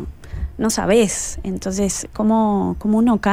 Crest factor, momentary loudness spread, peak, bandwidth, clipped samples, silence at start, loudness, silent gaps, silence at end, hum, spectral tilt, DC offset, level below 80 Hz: 14 dB; 10 LU; -4 dBFS; 16 kHz; under 0.1%; 0 s; -19 LUFS; none; 0 s; none; -5 dB/octave; under 0.1%; -34 dBFS